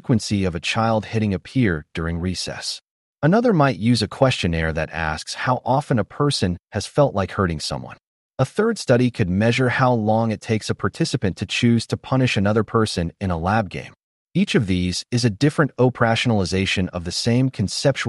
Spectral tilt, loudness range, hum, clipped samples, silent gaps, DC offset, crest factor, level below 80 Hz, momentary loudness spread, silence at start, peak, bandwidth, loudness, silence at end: -5.5 dB/octave; 2 LU; none; under 0.1%; 2.91-3.14 s, 8.07-8.30 s, 14.03-14.26 s; under 0.1%; 16 dB; -44 dBFS; 7 LU; 0.05 s; -4 dBFS; 11.5 kHz; -21 LUFS; 0 s